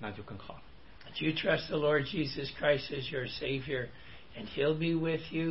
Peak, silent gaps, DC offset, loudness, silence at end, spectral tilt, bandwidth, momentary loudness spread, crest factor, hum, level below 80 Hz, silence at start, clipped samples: -16 dBFS; none; 0.3%; -33 LUFS; 0 s; -9 dB/octave; 5.8 kHz; 17 LU; 18 dB; none; -58 dBFS; 0 s; under 0.1%